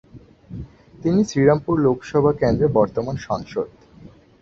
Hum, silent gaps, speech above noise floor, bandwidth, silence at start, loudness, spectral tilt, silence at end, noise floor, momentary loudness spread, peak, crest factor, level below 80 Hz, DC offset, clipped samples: none; none; 27 dB; 7.6 kHz; 0.15 s; -20 LUFS; -7.5 dB/octave; 0.35 s; -46 dBFS; 20 LU; -2 dBFS; 18 dB; -44 dBFS; under 0.1%; under 0.1%